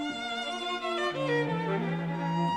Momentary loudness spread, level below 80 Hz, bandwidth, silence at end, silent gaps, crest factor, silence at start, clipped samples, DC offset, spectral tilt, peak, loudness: 4 LU; -70 dBFS; 10.5 kHz; 0 s; none; 14 dB; 0 s; under 0.1%; under 0.1%; -5.5 dB/octave; -18 dBFS; -31 LUFS